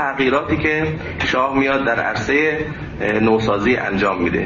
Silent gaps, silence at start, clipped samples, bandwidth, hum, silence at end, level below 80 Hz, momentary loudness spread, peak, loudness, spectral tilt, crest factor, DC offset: none; 0 s; under 0.1%; 7.4 kHz; none; 0 s; -40 dBFS; 6 LU; -4 dBFS; -18 LUFS; -6 dB/octave; 14 dB; under 0.1%